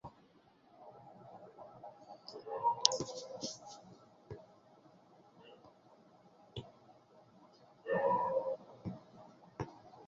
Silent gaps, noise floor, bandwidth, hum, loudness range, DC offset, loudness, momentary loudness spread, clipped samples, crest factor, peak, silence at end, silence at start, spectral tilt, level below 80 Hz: none; -67 dBFS; 7.6 kHz; none; 18 LU; under 0.1%; -38 LUFS; 27 LU; under 0.1%; 40 dB; -2 dBFS; 0 s; 0.05 s; -2 dB/octave; -72 dBFS